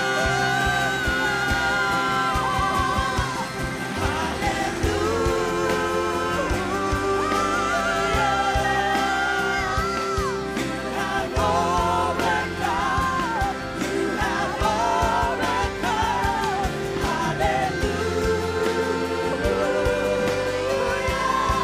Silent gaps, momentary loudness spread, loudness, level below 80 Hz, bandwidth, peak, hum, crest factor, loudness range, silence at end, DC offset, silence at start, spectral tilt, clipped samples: none; 4 LU; -23 LUFS; -36 dBFS; 16 kHz; -8 dBFS; none; 16 dB; 2 LU; 0 s; under 0.1%; 0 s; -4.5 dB/octave; under 0.1%